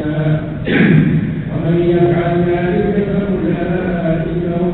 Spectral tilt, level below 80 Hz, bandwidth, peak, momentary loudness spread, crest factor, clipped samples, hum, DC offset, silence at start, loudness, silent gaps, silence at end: -11 dB/octave; -34 dBFS; 4.2 kHz; 0 dBFS; 6 LU; 14 dB; under 0.1%; none; under 0.1%; 0 s; -15 LUFS; none; 0 s